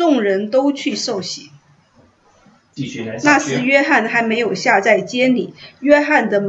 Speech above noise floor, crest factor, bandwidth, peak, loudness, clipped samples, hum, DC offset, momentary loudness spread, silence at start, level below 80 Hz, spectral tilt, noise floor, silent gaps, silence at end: 37 dB; 16 dB; 8.2 kHz; 0 dBFS; -15 LUFS; under 0.1%; none; under 0.1%; 13 LU; 0 s; -64 dBFS; -4 dB/octave; -53 dBFS; none; 0 s